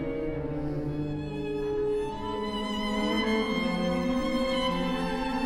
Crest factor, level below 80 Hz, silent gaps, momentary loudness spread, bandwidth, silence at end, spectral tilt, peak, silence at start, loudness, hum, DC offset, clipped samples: 14 dB; -44 dBFS; none; 6 LU; 16 kHz; 0 s; -6 dB/octave; -16 dBFS; 0 s; -30 LUFS; none; under 0.1%; under 0.1%